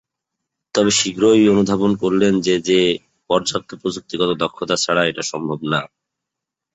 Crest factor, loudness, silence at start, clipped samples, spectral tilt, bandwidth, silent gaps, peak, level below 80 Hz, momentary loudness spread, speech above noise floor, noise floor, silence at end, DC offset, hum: 16 dB; -18 LUFS; 0.75 s; under 0.1%; -4 dB/octave; 8.2 kHz; none; -2 dBFS; -54 dBFS; 10 LU; 66 dB; -83 dBFS; 0.9 s; under 0.1%; none